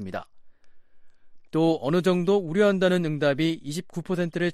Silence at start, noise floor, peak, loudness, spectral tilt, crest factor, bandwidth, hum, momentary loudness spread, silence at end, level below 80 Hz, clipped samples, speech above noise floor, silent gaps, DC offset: 0 s; -46 dBFS; -10 dBFS; -24 LUFS; -6.5 dB/octave; 16 dB; 13.5 kHz; none; 12 LU; 0 s; -62 dBFS; under 0.1%; 22 dB; none; under 0.1%